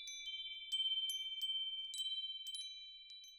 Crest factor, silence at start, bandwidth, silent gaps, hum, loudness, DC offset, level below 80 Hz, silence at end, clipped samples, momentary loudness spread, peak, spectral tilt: 16 dB; 0 s; 18 kHz; none; none; -40 LUFS; under 0.1%; -84 dBFS; 0 s; under 0.1%; 12 LU; -28 dBFS; 7.5 dB/octave